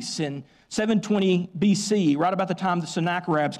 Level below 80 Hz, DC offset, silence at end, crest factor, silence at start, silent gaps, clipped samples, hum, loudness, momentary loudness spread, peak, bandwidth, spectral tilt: -64 dBFS; under 0.1%; 0 s; 12 dB; 0 s; none; under 0.1%; none; -24 LUFS; 8 LU; -12 dBFS; 12 kHz; -5.5 dB/octave